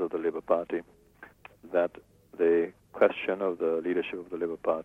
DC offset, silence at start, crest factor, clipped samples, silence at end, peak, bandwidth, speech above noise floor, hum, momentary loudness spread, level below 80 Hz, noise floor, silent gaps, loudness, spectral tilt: under 0.1%; 0 s; 22 dB; under 0.1%; 0 s; -8 dBFS; 4.1 kHz; 24 dB; none; 10 LU; -68 dBFS; -52 dBFS; none; -29 LUFS; -7 dB/octave